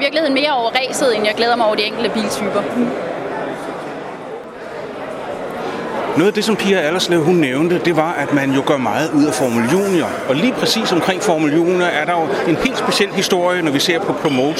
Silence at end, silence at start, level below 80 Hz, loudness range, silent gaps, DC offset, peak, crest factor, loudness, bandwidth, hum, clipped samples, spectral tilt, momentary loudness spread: 0 s; 0 s; -52 dBFS; 7 LU; none; under 0.1%; 0 dBFS; 16 dB; -16 LUFS; 16 kHz; none; under 0.1%; -4.5 dB/octave; 11 LU